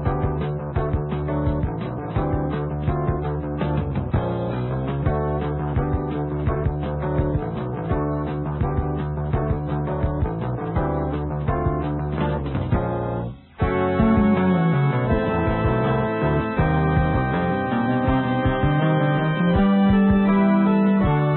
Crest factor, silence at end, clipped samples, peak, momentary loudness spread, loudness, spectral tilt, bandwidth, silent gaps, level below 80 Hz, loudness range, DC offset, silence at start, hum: 14 dB; 0 s; under 0.1%; -6 dBFS; 8 LU; -22 LUFS; -13 dB/octave; 4.2 kHz; none; -32 dBFS; 5 LU; under 0.1%; 0 s; none